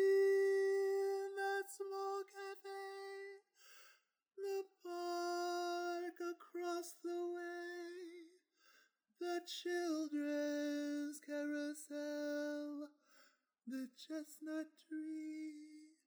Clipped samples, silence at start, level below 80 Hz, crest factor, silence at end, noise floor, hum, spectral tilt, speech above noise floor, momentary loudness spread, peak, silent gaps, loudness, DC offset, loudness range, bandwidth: under 0.1%; 0 s; under -90 dBFS; 16 dB; 0.15 s; -74 dBFS; none; -2 dB/octave; 28 dB; 15 LU; -28 dBFS; none; -43 LUFS; under 0.1%; 6 LU; over 20 kHz